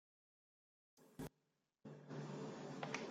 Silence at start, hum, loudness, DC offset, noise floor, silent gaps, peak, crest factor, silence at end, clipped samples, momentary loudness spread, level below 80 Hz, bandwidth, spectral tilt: 0.95 s; none; -52 LUFS; under 0.1%; -86 dBFS; none; -28 dBFS; 26 dB; 0 s; under 0.1%; 14 LU; -78 dBFS; 16 kHz; -5 dB/octave